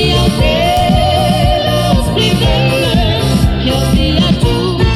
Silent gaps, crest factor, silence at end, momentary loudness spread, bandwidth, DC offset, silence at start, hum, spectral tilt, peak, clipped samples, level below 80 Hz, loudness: none; 10 dB; 0 s; 1 LU; 14 kHz; under 0.1%; 0 s; none; -5.5 dB/octave; 0 dBFS; under 0.1%; -18 dBFS; -11 LUFS